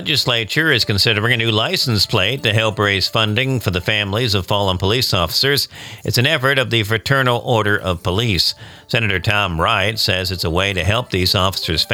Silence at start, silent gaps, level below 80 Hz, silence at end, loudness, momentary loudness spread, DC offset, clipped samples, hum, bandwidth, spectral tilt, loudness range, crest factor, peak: 0 s; none; -40 dBFS; 0 s; -16 LUFS; 4 LU; under 0.1%; under 0.1%; none; 19 kHz; -4 dB/octave; 2 LU; 16 dB; -2 dBFS